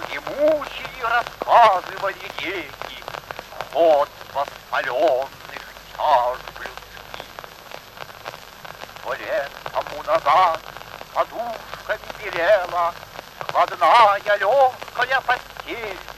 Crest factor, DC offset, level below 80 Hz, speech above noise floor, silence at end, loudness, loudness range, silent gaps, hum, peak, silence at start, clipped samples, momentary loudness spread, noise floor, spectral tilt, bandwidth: 20 dB; under 0.1%; -54 dBFS; 20 dB; 0 s; -21 LUFS; 8 LU; none; none; -2 dBFS; 0 s; under 0.1%; 20 LU; -40 dBFS; -3 dB/octave; 13 kHz